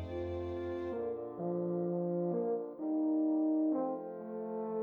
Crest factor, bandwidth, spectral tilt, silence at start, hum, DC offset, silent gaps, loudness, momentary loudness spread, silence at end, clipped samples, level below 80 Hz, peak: 12 dB; 4.3 kHz; -11 dB/octave; 0 s; none; under 0.1%; none; -36 LUFS; 8 LU; 0 s; under 0.1%; -64 dBFS; -24 dBFS